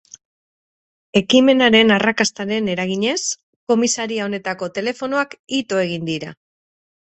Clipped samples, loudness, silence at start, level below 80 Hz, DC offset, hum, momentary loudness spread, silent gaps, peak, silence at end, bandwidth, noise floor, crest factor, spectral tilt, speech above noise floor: under 0.1%; -18 LUFS; 1.15 s; -60 dBFS; under 0.1%; none; 12 LU; 3.43-3.67 s, 5.39-5.44 s; 0 dBFS; 0.85 s; 8.4 kHz; under -90 dBFS; 20 dB; -3.5 dB/octave; over 72 dB